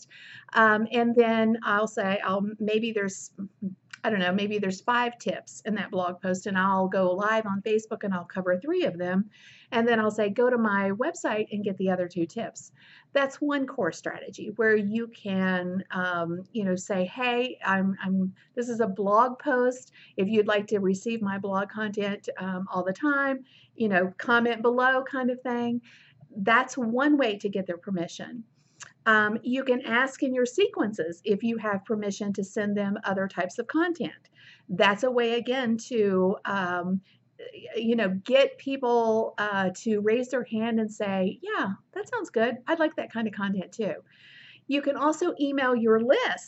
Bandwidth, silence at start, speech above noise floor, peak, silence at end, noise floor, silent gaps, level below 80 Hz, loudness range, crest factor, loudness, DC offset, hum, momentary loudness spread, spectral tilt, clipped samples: 8.2 kHz; 0.15 s; 24 dB; -8 dBFS; 0 s; -51 dBFS; none; -82 dBFS; 3 LU; 20 dB; -27 LUFS; under 0.1%; none; 10 LU; -5.5 dB/octave; under 0.1%